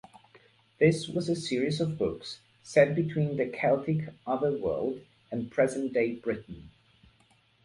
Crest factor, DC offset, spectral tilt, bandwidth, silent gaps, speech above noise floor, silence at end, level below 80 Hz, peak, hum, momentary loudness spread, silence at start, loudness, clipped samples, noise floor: 22 dB; under 0.1%; -6.5 dB/octave; 11.5 kHz; none; 37 dB; 0.95 s; -60 dBFS; -8 dBFS; none; 13 LU; 0.35 s; -29 LUFS; under 0.1%; -65 dBFS